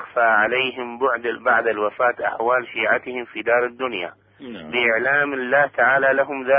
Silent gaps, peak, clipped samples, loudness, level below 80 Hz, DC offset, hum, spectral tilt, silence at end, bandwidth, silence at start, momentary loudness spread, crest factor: none; -6 dBFS; under 0.1%; -20 LUFS; -64 dBFS; under 0.1%; none; -8.5 dB/octave; 0 s; 5 kHz; 0 s; 10 LU; 16 dB